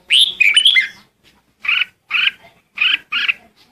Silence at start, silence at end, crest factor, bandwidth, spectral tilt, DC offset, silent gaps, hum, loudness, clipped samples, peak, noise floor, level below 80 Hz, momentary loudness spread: 0.1 s; 0.35 s; 16 dB; 14.5 kHz; 3 dB/octave; under 0.1%; none; none; -13 LUFS; under 0.1%; 0 dBFS; -55 dBFS; -66 dBFS; 14 LU